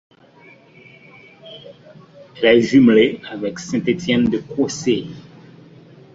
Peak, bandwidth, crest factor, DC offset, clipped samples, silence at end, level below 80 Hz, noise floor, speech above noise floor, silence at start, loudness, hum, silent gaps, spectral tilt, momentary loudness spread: -2 dBFS; 7.8 kHz; 18 dB; under 0.1%; under 0.1%; 0.95 s; -54 dBFS; -47 dBFS; 31 dB; 1.45 s; -17 LUFS; none; none; -5.5 dB/octave; 26 LU